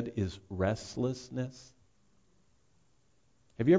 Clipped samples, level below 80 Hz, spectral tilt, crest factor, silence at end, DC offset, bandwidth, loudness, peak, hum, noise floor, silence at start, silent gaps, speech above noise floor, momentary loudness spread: under 0.1%; -54 dBFS; -7 dB/octave; 20 dB; 0 s; under 0.1%; 7.8 kHz; -35 LUFS; -14 dBFS; none; -72 dBFS; 0 s; none; 37 dB; 12 LU